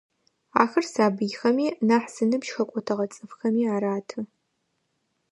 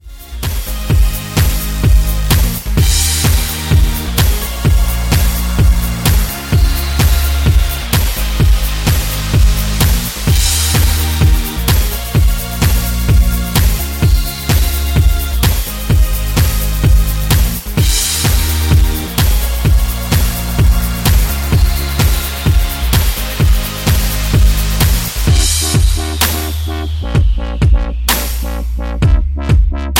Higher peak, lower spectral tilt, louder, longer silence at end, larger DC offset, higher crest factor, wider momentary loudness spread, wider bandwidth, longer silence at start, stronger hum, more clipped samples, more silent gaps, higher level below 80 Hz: about the same, -2 dBFS vs 0 dBFS; first, -5.5 dB/octave vs -4 dB/octave; second, -25 LUFS vs -14 LUFS; first, 1.05 s vs 0 s; neither; first, 24 dB vs 12 dB; first, 9 LU vs 4 LU; second, 11.5 kHz vs 17 kHz; first, 0.55 s vs 0.05 s; neither; neither; neither; second, -76 dBFS vs -14 dBFS